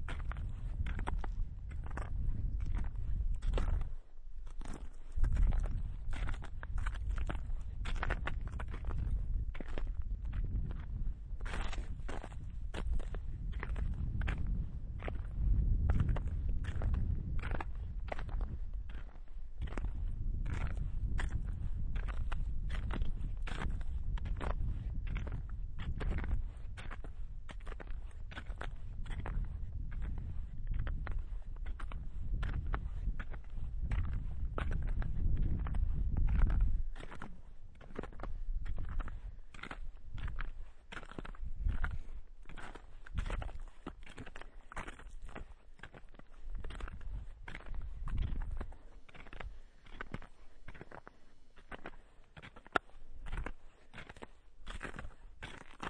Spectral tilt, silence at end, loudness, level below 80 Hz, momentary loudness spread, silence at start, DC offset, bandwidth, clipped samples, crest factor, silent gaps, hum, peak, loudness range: -7 dB/octave; 0 s; -42 LUFS; -38 dBFS; 15 LU; 0 s; under 0.1%; 9.4 kHz; under 0.1%; 26 dB; none; none; -10 dBFS; 10 LU